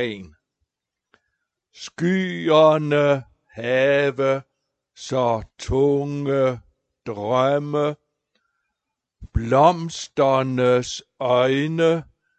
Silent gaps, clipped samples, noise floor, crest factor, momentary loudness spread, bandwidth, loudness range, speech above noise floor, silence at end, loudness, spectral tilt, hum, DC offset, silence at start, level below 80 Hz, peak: none; under 0.1%; -82 dBFS; 20 dB; 14 LU; 8.8 kHz; 4 LU; 62 dB; 0.35 s; -20 LUFS; -6 dB/octave; none; under 0.1%; 0 s; -44 dBFS; -2 dBFS